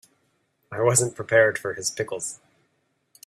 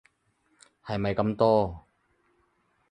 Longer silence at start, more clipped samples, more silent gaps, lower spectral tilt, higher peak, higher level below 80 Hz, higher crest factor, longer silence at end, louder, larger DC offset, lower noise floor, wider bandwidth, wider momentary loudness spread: second, 0.7 s vs 0.85 s; neither; neither; second, -3.5 dB/octave vs -8 dB/octave; first, -4 dBFS vs -8 dBFS; second, -64 dBFS vs -54 dBFS; about the same, 22 dB vs 20 dB; second, 0.9 s vs 1.1 s; first, -23 LUFS vs -26 LUFS; neither; about the same, -71 dBFS vs -71 dBFS; first, 14 kHz vs 9.8 kHz; second, 15 LU vs 22 LU